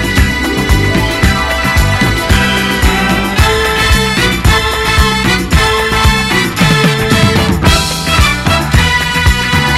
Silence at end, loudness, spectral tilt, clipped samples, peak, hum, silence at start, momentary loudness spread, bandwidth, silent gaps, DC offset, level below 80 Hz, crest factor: 0 s; -10 LUFS; -4 dB/octave; 0.3%; 0 dBFS; none; 0 s; 2 LU; 16 kHz; none; under 0.1%; -16 dBFS; 10 dB